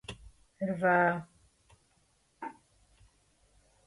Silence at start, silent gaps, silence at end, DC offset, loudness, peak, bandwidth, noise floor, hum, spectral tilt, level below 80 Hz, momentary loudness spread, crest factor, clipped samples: 0.1 s; none; 1.35 s; under 0.1%; -29 LUFS; -14 dBFS; 11.5 kHz; -71 dBFS; none; -7 dB/octave; -64 dBFS; 21 LU; 20 dB; under 0.1%